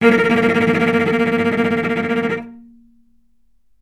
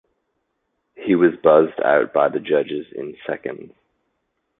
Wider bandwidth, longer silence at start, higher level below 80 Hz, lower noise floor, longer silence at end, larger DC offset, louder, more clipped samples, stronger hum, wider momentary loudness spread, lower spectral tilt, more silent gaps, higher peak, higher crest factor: first, 12.5 kHz vs 4 kHz; second, 0 s vs 1 s; first, -54 dBFS vs -64 dBFS; second, -63 dBFS vs -73 dBFS; first, 1.2 s vs 0.95 s; neither; about the same, -16 LUFS vs -18 LUFS; neither; neither; second, 8 LU vs 16 LU; second, -6.5 dB/octave vs -10.5 dB/octave; neither; about the same, 0 dBFS vs -2 dBFS; about the same, 18 dB vs 18 dB